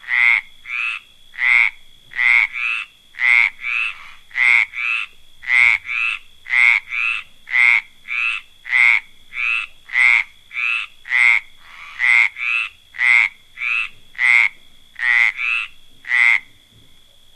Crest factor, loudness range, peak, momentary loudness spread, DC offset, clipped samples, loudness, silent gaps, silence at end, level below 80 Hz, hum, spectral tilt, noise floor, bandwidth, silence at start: 18 dB; 1 LU; 0 dBFS; 13 LU; under 0.1%; under 0.1%; -15 LUFS; none; 0.95 s; -52 dBFS; none; 2 dB/octave; -47 dBFS; 12.5 kHz; 0.05 s